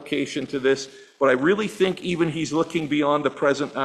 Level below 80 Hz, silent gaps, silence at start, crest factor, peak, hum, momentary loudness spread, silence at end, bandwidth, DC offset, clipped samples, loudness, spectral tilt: -62 dBFS; none; 0 s; 18 dB; -6 dBFS; none; 6 LU; 0 s; 13 kHz; under 0.1%; under 0.1%; -23 LUFS; -5 dB/octave